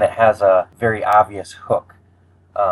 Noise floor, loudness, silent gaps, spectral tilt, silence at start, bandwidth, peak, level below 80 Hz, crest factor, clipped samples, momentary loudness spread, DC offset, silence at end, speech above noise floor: -53 dBFS; -17 LUFS; none; -6 dB/octave; 0 s; 12.5 kHz; 0 dBFS; -56 dBFS; 16 dB; under 0.1%; 9 LU; under 0.1%; 0 s; 36 dB